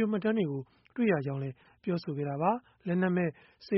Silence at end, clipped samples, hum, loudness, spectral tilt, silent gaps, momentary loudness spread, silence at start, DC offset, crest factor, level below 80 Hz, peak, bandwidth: 0 s; under 0.1%; none; -32 LUFS; -7 dB/octave; none; 11 LU; 0 s; under 0.1%; 18 dB; -70 dBFS; -14 dBFS; 5.8 kHz